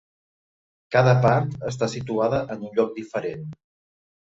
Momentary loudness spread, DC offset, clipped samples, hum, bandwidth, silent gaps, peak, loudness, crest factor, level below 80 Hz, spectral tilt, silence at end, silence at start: 12 LU; under 0.1%; under 0.1%; none; 7.8 kHz; none; -6 dBFS; -23 LUFS; 20 dB; -56 dBFS; -7 dB/octave; 0.8 s; 0.9 s